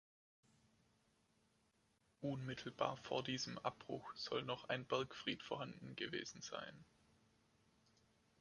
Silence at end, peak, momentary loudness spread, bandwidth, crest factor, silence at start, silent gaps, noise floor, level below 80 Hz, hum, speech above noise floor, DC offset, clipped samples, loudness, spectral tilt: 1.55 s; -24 dBFS; 8 LU; 11 kHz; 26 dB; 2.2 s; none; -80 dBFS; -80 dBFS; none; 34 dB; under 0.1%; under 0.1%; -46 LUFS; -4 dB/octave